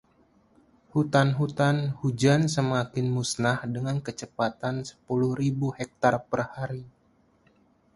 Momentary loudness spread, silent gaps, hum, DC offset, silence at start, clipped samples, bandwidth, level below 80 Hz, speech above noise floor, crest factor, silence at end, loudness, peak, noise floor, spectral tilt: 9 LU; none; none; under 0.1%; 0.95 s; under 0.1%; 11.5 kHz; -60 dBFS; 38 dB; 22 dB; 1.05 s; -27 LUFS; -6 dBFS; -64 dBFS; -6 dB/octave